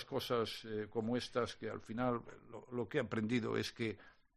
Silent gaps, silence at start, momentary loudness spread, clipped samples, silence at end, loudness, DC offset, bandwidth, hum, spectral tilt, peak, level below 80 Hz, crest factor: none; 0 s; 9 LU; under 0.1%; 0.25 s; -40 LUFS; under 0.1%; 13 kHz; none; -5.5 dB/octave; -22 dBFS; -68 dBFS; 18 dB